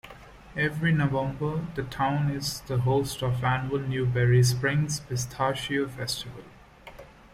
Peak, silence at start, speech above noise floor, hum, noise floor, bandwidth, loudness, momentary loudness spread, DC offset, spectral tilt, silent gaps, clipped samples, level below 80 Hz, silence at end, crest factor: -12 dBFS; 0.05 s; 21 dB; none; -48 dBFS; 16 kHz; -27 LUFS; 11 LU; under 0.1%; -5.5 dB/octave; none; under 0.1%; -50 dBFS; 0.25 s; 16 dB